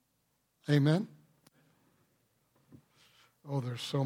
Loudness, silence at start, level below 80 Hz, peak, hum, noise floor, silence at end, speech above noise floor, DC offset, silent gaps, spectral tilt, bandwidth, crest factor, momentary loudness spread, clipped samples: -32 LUFS; 0.65 s; -80 dBFS; -16 dBFS; none; -77 dBFS; 0 s; 47 dB; under 0.1%; none; -7 dB/octave; 13.5 kHz; 20 dB; 16 LU; under 0.1%